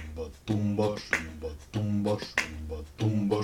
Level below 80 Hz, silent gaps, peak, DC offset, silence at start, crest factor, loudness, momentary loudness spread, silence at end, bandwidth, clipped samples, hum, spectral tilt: -48 dBFS; none; -10 dBFS; under 0.1%; 0 s; 22 dB; -31 LUFS; 12 LU; 0 s; 15.5 kHz; under 0.1%; none; -6 dB/octave